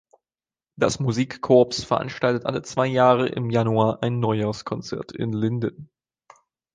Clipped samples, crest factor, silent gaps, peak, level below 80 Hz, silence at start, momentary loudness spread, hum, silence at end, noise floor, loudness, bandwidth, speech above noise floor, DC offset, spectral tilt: under 0.1%; 20 dB; none; -4 dBFS; -56 dBFS; 0.8 s; 11 LU; none; 0.9 s; under -90 dBFS; -23 LUFS; 9.8 kHz; over 68 dB; under 0.1%; -6 dB/octave